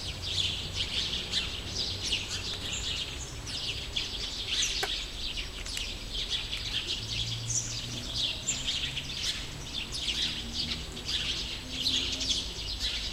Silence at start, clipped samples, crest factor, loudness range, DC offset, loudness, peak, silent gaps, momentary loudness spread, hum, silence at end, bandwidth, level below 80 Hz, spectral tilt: 0 s; under 0.1%; 18 dB; 2 LU; under 0.1%; -31 LUFS; -16 dBFS; none; 6 LU; none; 0 s; 16 kHz; -44 dBFS; -1.5 dB/octave